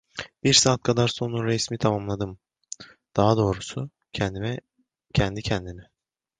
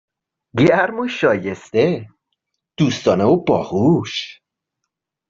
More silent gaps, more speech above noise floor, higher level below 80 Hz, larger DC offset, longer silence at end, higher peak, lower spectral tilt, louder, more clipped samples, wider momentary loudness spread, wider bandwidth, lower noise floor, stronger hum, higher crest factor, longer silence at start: neither; second, 20 dB vs 63 dB; first, -46 dBFS vs -56 dBFS; neither; second, 0.6 s vs 0.95 s; about the same, -4 dBFS vs -2 dBFS; second, -4 dB/octave vs -6.5 dB/octave; second, -24 LUFS vs -18 LUFS; neither; first, 19 LU vs 11 LU; first, 10 kHz vs 7.6 kHz; second, -44 dBFS vs -79 dBFS; neither; about the same, 20 dB vs 16 dB; second, 0.15 s vs 0.55 s